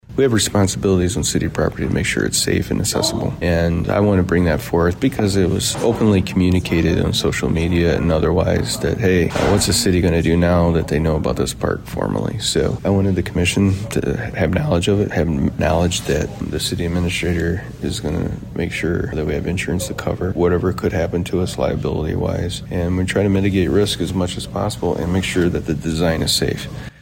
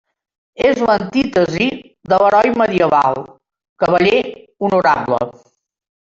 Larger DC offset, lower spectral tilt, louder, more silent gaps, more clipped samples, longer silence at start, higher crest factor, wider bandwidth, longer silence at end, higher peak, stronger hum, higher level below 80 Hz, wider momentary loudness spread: neither; about the same, -5 dB/octave vs -6 dB/octave; second, -18 LUFS vs -15 LUFS; second, none vs 3.69-3.76 s; neither; second, 0.1 s vs 0.6 s; about the same, 12 dB vs 14 dB; first, 16.5 kHz vs 7.6 kHz; second, 0.1 s vs 0.8 s; second, -6 dBFS vs -2 dBFS; neither; first, -32 dBFS vs -50 dBFS; second, 6 LU vs 9 LU